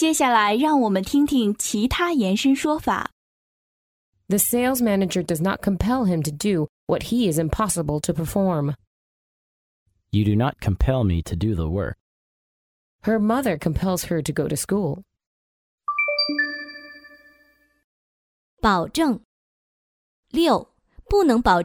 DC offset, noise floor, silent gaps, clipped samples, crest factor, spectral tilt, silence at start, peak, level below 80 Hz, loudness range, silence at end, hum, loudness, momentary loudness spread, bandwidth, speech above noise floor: under 0.1%; -60 dBFS; 3.12-4.12 s, 6.69-6.87 s, 8.87-9.86 s, 12.00-12.99 s, 15.27-15.78 s, 17.84-18.57 s, 19.25-20.23 s; under 0.1%; 18 dB; -5 dB/octave; 0 s; -4 dBFS; -38 dBFS; 5 LU; 0 s; none; -22 LUFS; 8 LU; 17.5 kHz; 39 dB